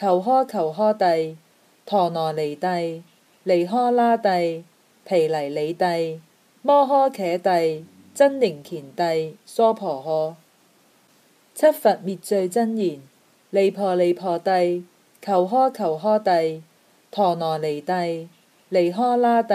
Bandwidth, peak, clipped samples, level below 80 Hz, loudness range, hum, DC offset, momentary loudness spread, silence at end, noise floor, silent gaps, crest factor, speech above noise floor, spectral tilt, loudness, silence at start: 15 kHz; -4 dBFS; under 0.1%; -78 dBFS; 2 LU; none; under 0.1%; 12 LU; 0 s; -58 dBFS; none; 16 dB; 38 dB; -6 dB/octave; -21 LUFS; 0 s